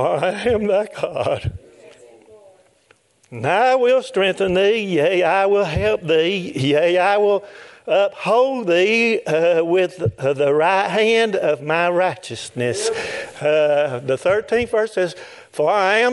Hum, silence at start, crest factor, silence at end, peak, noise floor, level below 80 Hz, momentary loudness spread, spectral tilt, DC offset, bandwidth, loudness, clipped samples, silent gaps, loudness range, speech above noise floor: none; 0 s; 16 dB; 0 s; -2 dBFS; -57 dBFS; -50 dBFS; 8 LU; -5 dB/octave; under 0.1%; 11.5 kHz; -18 LUFS; under 0.1%; none; 4 LU; 39 dB